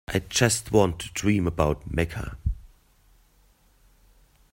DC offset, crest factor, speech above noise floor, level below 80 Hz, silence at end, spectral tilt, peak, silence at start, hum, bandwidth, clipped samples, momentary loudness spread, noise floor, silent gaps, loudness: under 0.1%; 22 dB; 36 dB; -40 dBFS; 1.85 s; -4.5 dB/octave; -4 dBFS; 0.1 s; none; 16.5 kHz; under 0.1%; 11 LU; -60 dBFS; none; -25 LUFS